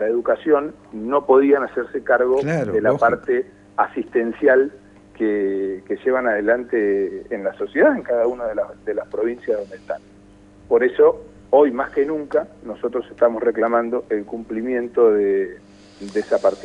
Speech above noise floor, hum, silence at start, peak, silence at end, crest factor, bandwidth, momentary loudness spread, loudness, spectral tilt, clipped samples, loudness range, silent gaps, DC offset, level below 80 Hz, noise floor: 28 dB; 50 Hz at -55 dBFS; 0 s; -2 dBFS; 0 s; 18 dB; 8.6 kHz; 11 LU; -20 LUFS; -7.5 dB/octave; under 0.1%; 3 LU; none; under 0.1%; -56 dBFS; -47 dBFS